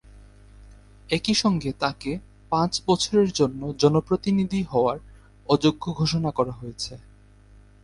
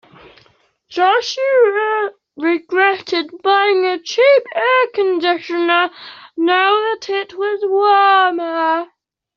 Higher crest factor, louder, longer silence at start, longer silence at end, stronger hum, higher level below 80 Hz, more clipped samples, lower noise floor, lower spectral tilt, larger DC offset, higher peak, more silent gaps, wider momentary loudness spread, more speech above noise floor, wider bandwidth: first, 20 dB vs 14 dB; second, -24 LUFS vs -15 LUFS; second, 0.15 s vs 0.9 s; first, 0.85 s vs 0.5 s; neither; first, -48 dBFS vs -68 dBFS; neither; second, -51 dBFS vs -55 dBFS; first, -5.5 dB/octave vs 1.5 dB/octave; neither; second, -6 dBFS vs -2 dBFS; neither; about the same, 12 LU vs 10 LU; second, 28 dB vs 40 dB; first, 11.5 kHz vs 7.2 kHz